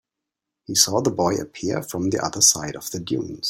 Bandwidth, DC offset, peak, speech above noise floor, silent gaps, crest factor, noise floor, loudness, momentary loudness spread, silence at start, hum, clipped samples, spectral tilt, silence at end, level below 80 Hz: 16.5 kHz; under 0.1%; 0 dBFS; 62 dB; none; 22 dB; -85 dBFS; -21 LUFS; 11 LU; 0.7 s; none; under 0.1%; -2.5 dB/octave; 0 s; -56 dBFS